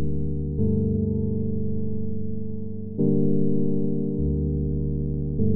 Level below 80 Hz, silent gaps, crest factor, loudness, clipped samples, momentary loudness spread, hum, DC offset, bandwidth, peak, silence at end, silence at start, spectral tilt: -36 dBFS; none; 14 dB; -26 LUFS; under 0.1%; 9 LU; none; under 0.1%; 1 kHz; -10 dBFS; 0 s; 0 s; -17.5 dB/octave